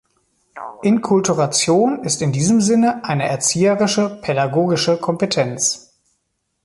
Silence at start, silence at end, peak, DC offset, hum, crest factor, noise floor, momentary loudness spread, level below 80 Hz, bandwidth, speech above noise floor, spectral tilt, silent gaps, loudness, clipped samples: 0.55 s; 0.85 s; -4 dBFS; under 0.1%; none; 14 dB; -71 dBFS; 5 LU; -56 dBFS; 11.5 kHz; 54 dB; -4.5 dB/octave; none; -17 LUFS; under 0.1%